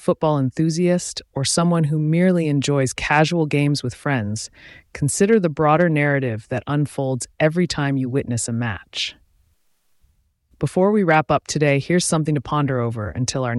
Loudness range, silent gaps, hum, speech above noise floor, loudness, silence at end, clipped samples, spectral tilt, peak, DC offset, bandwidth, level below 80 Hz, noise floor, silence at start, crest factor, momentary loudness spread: 5 LU; none; none; 43 dB; -20 LUFS; 0 s; under 0.1%; -5.5 dB/octave; -4 dBFS; under 0.1%; 12 kHz; -50 dBFS; -63 dBFS; 0 s; 16 dB; 8 LU